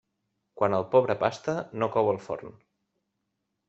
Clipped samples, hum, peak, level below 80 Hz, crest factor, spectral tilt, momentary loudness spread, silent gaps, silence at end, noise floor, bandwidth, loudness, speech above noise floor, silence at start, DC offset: under 0.1%; none; -6 dBFS; -68 dBFS; 22 dB; -6.5 dB/octave; 10 LU; none; 1.2 s; -81 dBFS; 8 kHz; -27 LUFS; 54 dB; 0.55 s; under 0.1%